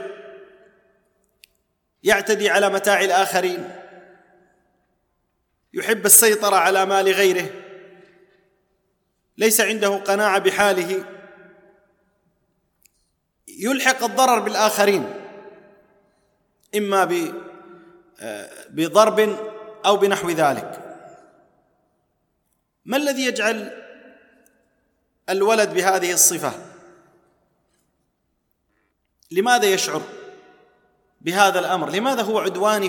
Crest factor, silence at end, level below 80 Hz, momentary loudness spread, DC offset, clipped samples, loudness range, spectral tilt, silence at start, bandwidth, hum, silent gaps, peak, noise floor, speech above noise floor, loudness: 22 dB; 0 s; -68 dBFS; 20 LU; under 0.1%; under 0.1%; 10 LU; -2 dB/octave; 0 s; 19 kHz; none; none; 0 dBFS; -71 dBFS; 52 dB; -18 LUFS